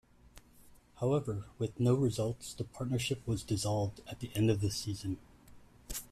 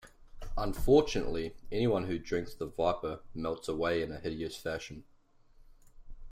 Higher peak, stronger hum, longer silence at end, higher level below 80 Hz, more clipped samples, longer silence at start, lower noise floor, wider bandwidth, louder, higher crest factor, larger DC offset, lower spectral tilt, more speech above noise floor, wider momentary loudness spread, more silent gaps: second, -18 dBFS vs -12 dBFS; neither; about the same, 0.05 s vs 0 s; second, -56 dBFS vs -46 dBFS; neither; first, 0.35 s vs 0.05 s; about the same, -60 dBFS vs -61 dBFS; about the same, 15 kHz vs 16 kHz; about the same, -35 LUFS vs -33 LUFS; about the same, 18 dB vs 20 dB; neither; about the same, -6 dB/octave vs -6 dB/octave; about the same, 26 dB vs 29 dB; second, 11 LU vs 14 LU; neither